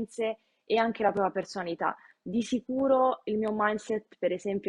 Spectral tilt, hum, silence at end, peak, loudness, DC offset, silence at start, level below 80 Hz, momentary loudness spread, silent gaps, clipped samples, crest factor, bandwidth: -5.5 dB/octave; none; 0 s; -12 dBFS; -29 LUFS; under 0.1%; 0 s; -68 dBFS; 9 LU; none; under 0.1%; 18 dB; 11 kHz